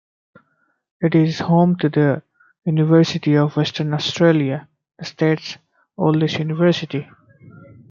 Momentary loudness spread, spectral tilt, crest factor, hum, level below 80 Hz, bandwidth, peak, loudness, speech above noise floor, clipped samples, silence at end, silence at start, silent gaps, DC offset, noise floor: 13 LU; -7 dB/octave; 16 dB; none; -62 dBFS; 7.2 kHz; -2 dBFS; -18 LUFS; 49 dB; under 0.1%; 0.25 s; 1 s; none; under 0.1%; -66 dBFS